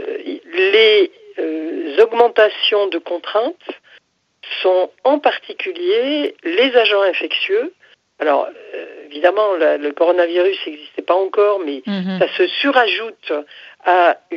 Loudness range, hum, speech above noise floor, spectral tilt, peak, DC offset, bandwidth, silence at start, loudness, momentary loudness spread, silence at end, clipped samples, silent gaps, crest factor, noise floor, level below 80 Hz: 4 LU; none; 36 dB; -6 dB/octave; 0 dBFS; under 0.1%; 6.6 kHz; 0 s; -16 LUFS; 13 LU; 0 s; under 0.1%; none; 16 dB; -52 dBFS; -76 dBFS